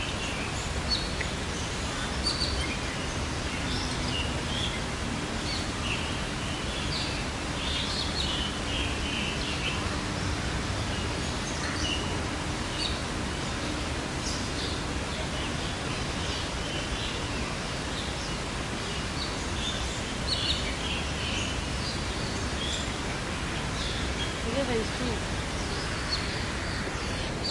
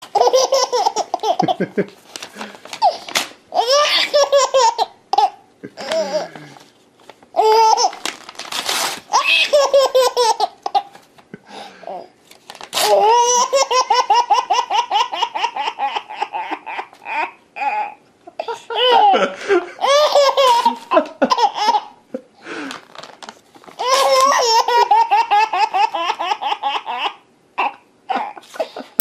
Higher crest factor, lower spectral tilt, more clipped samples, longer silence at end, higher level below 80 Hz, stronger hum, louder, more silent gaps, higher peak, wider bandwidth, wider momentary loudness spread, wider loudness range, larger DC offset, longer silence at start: about the same, 16 dB vs 18 dB; first, -3.5 dB/octave vs -1.5 dB/octave; neither; second, 0 s vs 0.2 s; first, -38 dBFS vs -68 dBFS; neither; second, -30 LUFS vs -16 LUFS; neither; second, -14 dBFS vs 0 dBFS; second, 11.5 kHz vs 14.5 kHz; second, 3 LU vs 18 LU; second, 2 LU vs 6 LU; neither; about the same, 0 s vs 0 s